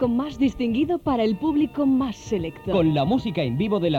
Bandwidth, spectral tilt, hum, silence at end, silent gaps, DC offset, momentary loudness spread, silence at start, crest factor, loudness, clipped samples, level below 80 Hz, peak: 7.8 kHz; -7.5 dB/octave; none; 0 s; none; under 0.1%; 5 LU; 0 s; 14 dB; -23 LUFS; under 0.1%; -46 dBFS; -8 dBFS